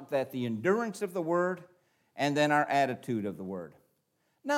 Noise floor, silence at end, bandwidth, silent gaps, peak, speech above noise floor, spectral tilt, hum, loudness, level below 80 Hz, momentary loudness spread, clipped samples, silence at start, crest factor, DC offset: -76 dBFS; 0 s; 16.5 kHz; none; -14 dBFS; 46 dB; -5.5 dB/octave; none; -30 LUFS; -82 dBFS; 16 LU; under 0.1%; 0 s; 18 dB; under 0.1%